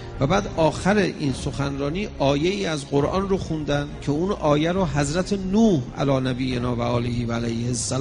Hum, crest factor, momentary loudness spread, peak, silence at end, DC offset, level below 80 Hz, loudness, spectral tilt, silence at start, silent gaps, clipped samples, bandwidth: none; 18 dB; 6 LU; -4 dBFS; 0 s; under 0.1%; -38 dBFS; -23 LUFS; -6 dB/octave; 0 s; none; under 0.1%; 10.5 kHz